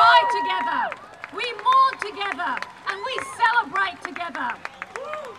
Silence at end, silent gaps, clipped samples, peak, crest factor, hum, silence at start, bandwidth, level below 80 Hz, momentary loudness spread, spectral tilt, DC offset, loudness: 0 s; none; under 0.1%; -4 dBFS; 20 dB; none; 0 s; 12.5 kHz; -68 dBFS; 15 LU; -2 dB/octave; under 0.1%; -23 LUFS